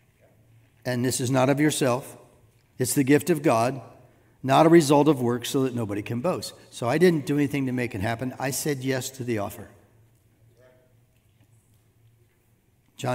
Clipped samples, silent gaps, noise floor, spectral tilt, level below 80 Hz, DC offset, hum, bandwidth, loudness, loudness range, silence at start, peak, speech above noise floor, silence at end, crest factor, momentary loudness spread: under 0.1%; none; -64 dBFS; -5.5 dB/octave; -66 dBFS; under 0.1%; none; 16 kHz; -24 LUFS; 11 LU; 0.85 s; -4 dBFS; 41 dB; 0 s; 22 dB; 12 LU